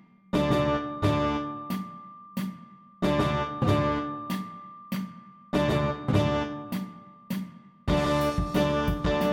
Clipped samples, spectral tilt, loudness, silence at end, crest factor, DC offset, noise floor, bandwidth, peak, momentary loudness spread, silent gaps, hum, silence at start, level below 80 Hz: under 0.1%; -7 dB/octave; -28 LUFS; 0 s; 18 dB; under 0.1%; -49 dBFS; 17 kHz; -10 dBFS; 13 LU; none; none; 0.35 s; -42 dBFS